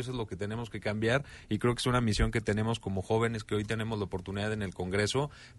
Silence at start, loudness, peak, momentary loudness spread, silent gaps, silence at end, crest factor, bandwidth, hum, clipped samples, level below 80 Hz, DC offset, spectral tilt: 0 s; -32 LUFS; -14 dBFS; 8 LU; none; 0 s; 18 dB; 11.5 kHz; none; under 0.1%; -44 dBFS; under 0.1%; -5.5 dB/octave